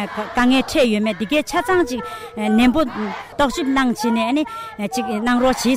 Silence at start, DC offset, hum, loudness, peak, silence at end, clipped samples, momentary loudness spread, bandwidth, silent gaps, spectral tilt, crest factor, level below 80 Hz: 0 s; under 0.1%; none; -19 LUFS; -6 dBFS; 0 s; under 0.1%; 10 LU; 16 kHz; none; -4.5 dB/octave; 14 dB; -42 dBFS